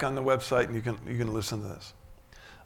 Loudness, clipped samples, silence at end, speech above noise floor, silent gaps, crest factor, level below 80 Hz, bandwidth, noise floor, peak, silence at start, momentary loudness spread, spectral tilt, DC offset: -30 LUFS; under 0.1%; 0 s; 22 dB; none; 20 dB; -52 dBFS; 18 kHz; -52 dBFS; -12 dBFS; 0 s; 16 LU; -5.5 dB/octave; under 0.1%